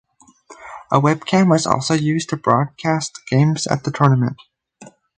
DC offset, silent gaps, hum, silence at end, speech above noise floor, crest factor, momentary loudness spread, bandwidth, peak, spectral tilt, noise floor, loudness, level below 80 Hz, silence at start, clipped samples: under 0.1%; none; none; 0.3 s; 30 dB; 18 dB; 7 LU; 9.4 kHz; 0 dBFS; -6 dB/octave; -47 dBFS; -18 LUFS; -56 dBFS; 0.5 s; under 0.1%